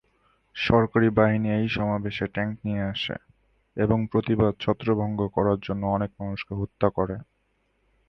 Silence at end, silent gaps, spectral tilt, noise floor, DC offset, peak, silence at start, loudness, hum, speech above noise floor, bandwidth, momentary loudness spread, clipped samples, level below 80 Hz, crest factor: 0.85 s; none; -8.5 dB/octave; -70 dBFS; under 0.1%; -6 dBFS; 0.55 s; -25 LUFS; none; 46 dB; 6.2 kHz; 11 LU; under 0.1%; -48 dBFS; 20 dB